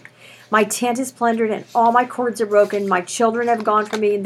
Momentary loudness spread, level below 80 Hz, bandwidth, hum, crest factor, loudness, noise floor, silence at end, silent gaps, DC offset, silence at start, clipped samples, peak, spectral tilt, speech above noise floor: 5 LU; -76 dBFS; 15 kHz; none; 18 dB; -18 LUFS; -44 dBFS; 0 s; none; under 0.1%; 0.5 s; under 0.1%; -2 dBFS; -4 dB/octave; 26 dB